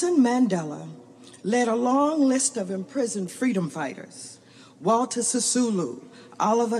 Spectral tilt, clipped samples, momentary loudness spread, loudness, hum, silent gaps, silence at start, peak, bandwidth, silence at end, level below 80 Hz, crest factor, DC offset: -4.5 dB/octave; under 0.1%; 18 LU; -24 LUFS; none; none; 0 s; -10 dBFS; 13 kHz; 0 s; -84 dBFS; 14 dB; under 0.1%